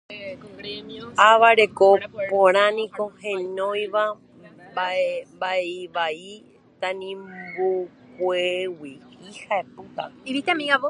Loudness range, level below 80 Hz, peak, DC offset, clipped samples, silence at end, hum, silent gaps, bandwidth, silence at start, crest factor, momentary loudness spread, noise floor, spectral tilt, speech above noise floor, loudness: 9 LU; -68 dBFS; 0 dBFS; under 0.1%; under 0.1%; 0 s; none; none; 11 kHz; 0.1 s; 22 dB; 20 LU; -47 dBFS; -3.5 dB/octave; 25 dB; -22 LUFS